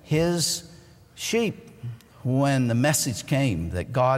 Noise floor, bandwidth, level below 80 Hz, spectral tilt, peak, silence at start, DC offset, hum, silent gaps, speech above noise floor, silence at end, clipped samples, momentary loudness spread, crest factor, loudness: -50 dBFS; 16 kHz; -48 dBFS; -4.5 dB/octave; -10 dBFS; 0.05 s; under 0.1%; none; none; 26 dB; 0 s; under 0.1%; 15 LU; 16 dB; -24 LUFS